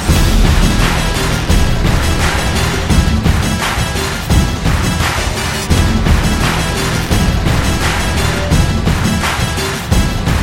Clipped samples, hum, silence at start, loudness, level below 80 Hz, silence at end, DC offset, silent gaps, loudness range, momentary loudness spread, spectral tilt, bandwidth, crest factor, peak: under 0.1%; none; 0 s; -14 LUFS; -16 dBFS; 0 s; under 0.1%; none; 1 LU; 3 LU; -4.5 dB/octave; 16.5 kHz; 12 dB; 0 dBFS